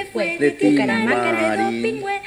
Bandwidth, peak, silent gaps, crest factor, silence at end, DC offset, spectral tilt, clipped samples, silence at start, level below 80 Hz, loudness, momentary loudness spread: 12.5 kHz; -4 dBFS; none; 14 dB; 0 s; under 0.1%; -5 dB/octave; under 0.1%; 0 s; -58 dBFS; -19 LUFS; 6 LU